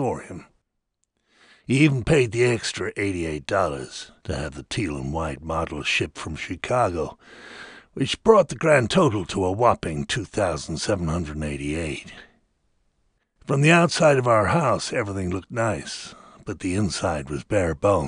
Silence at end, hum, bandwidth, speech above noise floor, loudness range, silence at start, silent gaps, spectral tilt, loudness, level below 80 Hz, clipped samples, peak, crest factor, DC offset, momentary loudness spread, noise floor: 0 s; none; 11 kHz; 53 dB; 6 LU; 0 s; none; -5.5 dB/octave; -23 LUFS; -44 dBFS; under 0.1%; -2 dBFS; 22 dB; under 0.1%; 17 LU; -76 dBFS